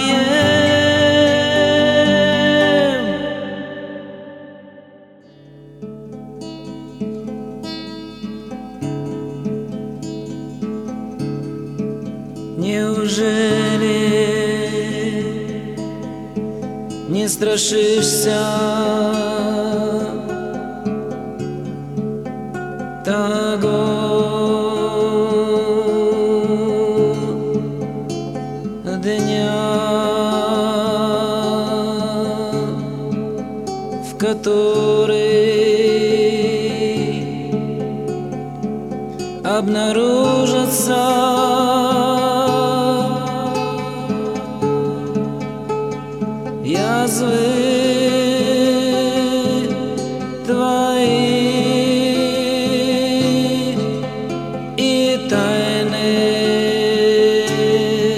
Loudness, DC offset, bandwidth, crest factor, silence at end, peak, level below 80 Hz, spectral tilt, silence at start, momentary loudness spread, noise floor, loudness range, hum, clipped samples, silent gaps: -18 LUFS; under 0.1%; 15.5 kHz; 16 dB; 0 s; -2 dBFS; -50 dBFS; -4.5 dB/octave; 0 s; 13 LU; -44 dBFS; 11 LU; none; under 0.1%; none